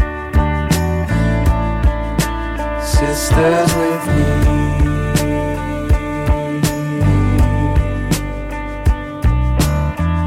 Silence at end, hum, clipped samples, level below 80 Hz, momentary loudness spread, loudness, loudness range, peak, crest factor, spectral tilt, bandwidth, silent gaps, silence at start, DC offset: 0 s; none; under 0.1%; -20 dBFS; 6 LU; -17 LUFS; 2 LU; -4 dBFS; 10 dB; -6 dB/octave; 16 kHz; none; 0 s; under 0.1%